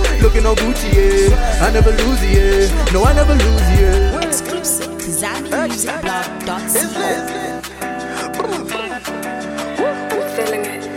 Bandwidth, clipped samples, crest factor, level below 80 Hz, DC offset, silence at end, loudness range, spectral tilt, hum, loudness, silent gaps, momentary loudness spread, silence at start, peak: 17 kHz; under 0.1%; 14 dB; -18 dBFS; under 0.1%; 0 s; 8 LU; -4.5 dB/octave; none; -16 LUFS; none; 11 LU; 0 s; 0 dBFS